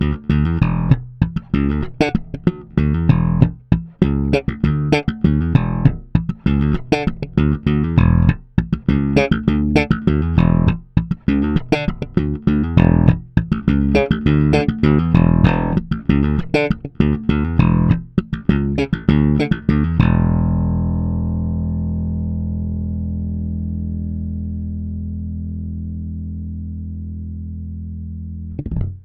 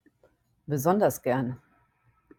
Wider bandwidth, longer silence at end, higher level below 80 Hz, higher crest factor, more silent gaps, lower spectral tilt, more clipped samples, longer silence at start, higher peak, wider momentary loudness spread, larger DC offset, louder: second, 8.2 kHz vs 17.5 kHz; second, 0.05 s vs 0.8 s; first, -26 dBFS vs -64 dBFS; about the same, 16 dB vs 20 dB; neither; first, -9 dB/octave vs -6.5 dB/octave; neither; second, 0 s vs 0.7 s; first, 0 dBFS vs -10 dBFS; second, 12 LU vs 19 LU; neither; first, -18 LUFS vs -27 LUFS